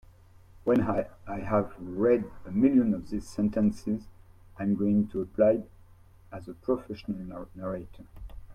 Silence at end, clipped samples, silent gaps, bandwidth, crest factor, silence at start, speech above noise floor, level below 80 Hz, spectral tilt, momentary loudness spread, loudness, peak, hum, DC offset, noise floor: 0 s; under 0.1%; none; 10 kHz; 18 dB; 0.55 s; 27 dB; -52 dBFS; -9 dB/octave; 18 LU; -29 LUFS; -10 dBFS; none; under 0.1%; -54 dBFS